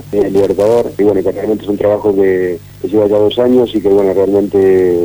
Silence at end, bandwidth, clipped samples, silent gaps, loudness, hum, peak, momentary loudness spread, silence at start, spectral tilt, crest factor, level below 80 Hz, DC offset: 0 s; over 20 kHz; under 0.1%; none; -12 LUFS; 50 Hz at -35 dBFS; 0 dBFS; 6 LU; 0 s; -7.5 dB/octave; 10 dB; -42 dBFS; under 0.1%